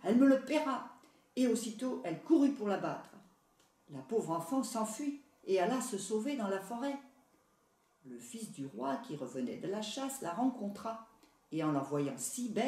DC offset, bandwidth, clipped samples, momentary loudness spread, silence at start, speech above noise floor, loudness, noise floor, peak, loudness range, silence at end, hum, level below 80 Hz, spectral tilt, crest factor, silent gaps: under 0.1%; 15 kHz; under 0.1%; 16 LU; 0 s; 38 dB; -36 LUFS; -73 dBFS; -16 dBFS; 7 LU; 0 s; none; -84 dBFS; -5 dB/octave; 18 dB; none